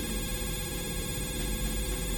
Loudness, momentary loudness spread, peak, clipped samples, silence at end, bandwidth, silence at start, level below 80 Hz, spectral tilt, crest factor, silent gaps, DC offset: -33 LUFS; 1 LU; -18 dBFS; under 0.1%; 0 s; 17 kHz; 0 s; -36 dBFS; -3.5 dB/octave; 14 dB; none; under 0.1%